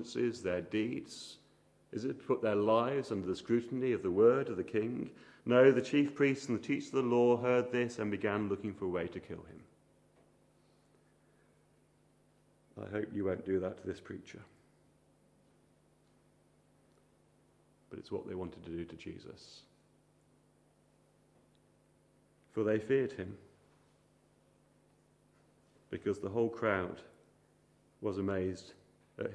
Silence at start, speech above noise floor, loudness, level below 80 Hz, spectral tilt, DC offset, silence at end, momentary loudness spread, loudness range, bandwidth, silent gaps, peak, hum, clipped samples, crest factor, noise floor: 0 s; 36 dB; -34 LUFS; -72 dBFS; -6.5 dB/octave; under 0.1%; 0 s; 20 LU; 18 LU; 11 kHz; none; -14 dBFS; 50 Hz at -70 dBFS; under 0.1%; 24 dB; -69 dBFS